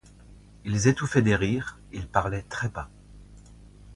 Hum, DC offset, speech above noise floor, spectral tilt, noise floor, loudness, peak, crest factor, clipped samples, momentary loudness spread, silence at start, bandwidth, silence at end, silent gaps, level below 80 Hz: none; under 0.1%; 25 dB; -6 dB/octave; -50 dBFS; -26 LUFS; -4 dBFS; 22 dB; under 0.1%; 17 LU; 0.3 s; 11.5 kHz; 0 s; none; -46 dBFS